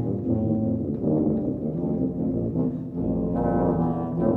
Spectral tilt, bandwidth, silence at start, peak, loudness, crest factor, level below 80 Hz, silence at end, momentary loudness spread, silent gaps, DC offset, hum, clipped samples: -13 dB/octave; 2.7 kHz; 0 s; -8 dBFS; -25 LUFS; 16 dB; -44 dBFS; 0 s; 4 LU; none; under 0.1%; none; under 0.1%